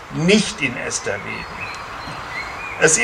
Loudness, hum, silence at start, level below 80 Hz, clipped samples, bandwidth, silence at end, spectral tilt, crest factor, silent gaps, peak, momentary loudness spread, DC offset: -21 LUFS; none; 0 s; -46 dBFS; under 0.1%; 15 kHz; 0 s; -3 dB/octave; 20 dB; none; 0 dBFS; 13 LU; under 0.1%